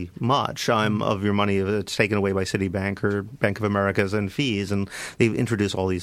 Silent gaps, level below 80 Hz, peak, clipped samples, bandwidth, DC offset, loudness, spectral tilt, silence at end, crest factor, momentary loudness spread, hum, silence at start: none; -54 dBFS; -4 dBFS; under 0.1%; 15 kHz; under 0.1%; -24 LUFS; -5.5 dB/octave; 0 s; 20 dB; 4 LU; none; 0 s